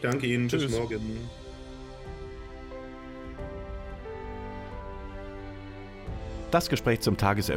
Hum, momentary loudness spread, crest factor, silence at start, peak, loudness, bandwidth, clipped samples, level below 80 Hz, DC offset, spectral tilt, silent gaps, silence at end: none; 17 LU; 22 dB; 0 s; -10 dBFS; -32 LUFS; 16 kHz; under 0.1%; -44 dBFS; under 0.1%; -5.5 dB/octave; none; 0 s